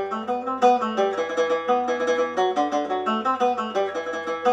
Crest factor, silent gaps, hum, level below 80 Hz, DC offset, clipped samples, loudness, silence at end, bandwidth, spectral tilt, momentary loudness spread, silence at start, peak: 18 dB; none; none; -74 dBFS; under 0.1%; under 0.1%; -23 LUFS; 0 s; 9.4 kHz; -4 dB/octave; 7 LU; 0 s; -6 dBFS